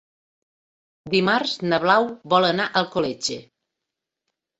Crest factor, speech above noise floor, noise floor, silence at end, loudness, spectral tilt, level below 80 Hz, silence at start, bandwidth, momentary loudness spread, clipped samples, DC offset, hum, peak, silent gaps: 20 dB; 63 dB; -84 dBFS; 1.15 s; -21 LUFS; -4 dB/octave; -64 dBFS; 1.05 s; 8.2 kHz; 8 LU; under 0.1%; under 0.1%; none; -2 dBFS; none